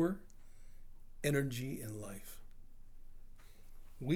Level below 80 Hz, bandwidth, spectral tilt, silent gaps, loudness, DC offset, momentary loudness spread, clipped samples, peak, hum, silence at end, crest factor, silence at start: -54 dBFS; 20 kHz; -6 dB/octave; none; -40 LUFS; under 0.1%; 28 LU; under 0.1%; -20 dBFS; none; 0 s; 20 dB; 0 s